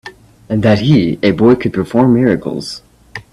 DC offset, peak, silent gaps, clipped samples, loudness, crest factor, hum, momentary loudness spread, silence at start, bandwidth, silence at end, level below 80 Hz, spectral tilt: under 0.1%; 0 dBFS; none; under 0.1%; -12 LUFS; 14 dB; none; 17 LU; 0.05 s; 12 kHz; 0.1 s; -42 dBFS; -7.5 dB/octave